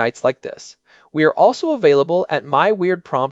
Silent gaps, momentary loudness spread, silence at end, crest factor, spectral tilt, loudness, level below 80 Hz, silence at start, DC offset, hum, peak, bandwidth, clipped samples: none; 14 LU; 0 s; 16 dB; -6 dB/octave; -17 LUFS; -66 dBFS; 0 s; under 0.1%; none; -2 dBFS; 8 kHz; under 0.1%